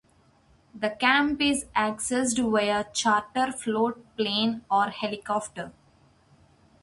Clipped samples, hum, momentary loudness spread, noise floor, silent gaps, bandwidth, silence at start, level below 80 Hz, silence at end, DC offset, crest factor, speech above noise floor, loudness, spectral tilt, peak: under 0.1%; none; 10 LU; -61 dBFS; none; 11.5 kHz; 0.75 s; -60 dBFS; 1.1 s; under 0.1%; 20 dB; 35 dB; -26 LUFS; -3 dB/octave; -6 dBFS